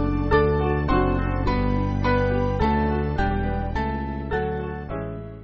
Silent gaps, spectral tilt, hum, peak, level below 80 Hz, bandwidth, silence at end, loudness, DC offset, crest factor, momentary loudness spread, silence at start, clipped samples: none; -6.5 dB/octave; none; -6 dBFS; -30 dBFS; 6.6 kHz; 0 s; -24 LUFS; 0.1%; 16 dB; 9 LU; 0 s; under 0.1%